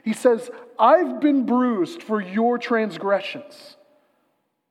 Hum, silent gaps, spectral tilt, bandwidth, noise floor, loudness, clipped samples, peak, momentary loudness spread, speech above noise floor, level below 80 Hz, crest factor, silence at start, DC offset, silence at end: none; none; -5.5 dB/octave; 13 kHz; -70 dBFS; -21 LUFS; under 0.1%; -4 dBFS; 10 LU; 49 dB; -90 dBFS; 18 dB; 0.05 s; under 0.1%; 1.05 s